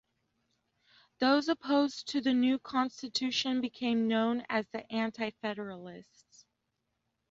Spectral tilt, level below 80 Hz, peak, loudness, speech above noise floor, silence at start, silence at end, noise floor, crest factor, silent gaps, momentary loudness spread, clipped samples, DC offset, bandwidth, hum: -4 dB/octave; -74 dBFS; -16 dBFS; -31 LUFS; 51 dB; 1.2 s; 1.3 s; -83 dBFS; 18 dB; none; 10 LU; under 0.1%; under 0.1%; 7.8 kHz; none